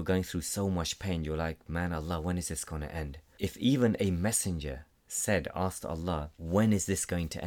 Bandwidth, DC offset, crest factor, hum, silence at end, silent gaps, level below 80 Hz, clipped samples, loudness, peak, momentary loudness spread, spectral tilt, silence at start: 19 kHz; under 0.1%; 16 dB; none; 0 s; none; -46 dBFS; under 0.1%; -32 LUFS; -14 dBFS; 11 LU; -5 dB/octave; 0 s